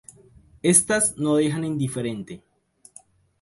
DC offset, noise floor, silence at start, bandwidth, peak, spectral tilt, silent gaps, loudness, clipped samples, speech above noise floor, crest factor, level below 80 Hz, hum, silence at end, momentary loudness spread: under 0.1%; -53 dBFS; 0.65 s; 12 kHz; -4 dBFS; -4 dB/octave; none; -21 LUFS; under 0.1%; 31 dB; 22 dB; -58 dBFS; none; 1.05 s; 18 LU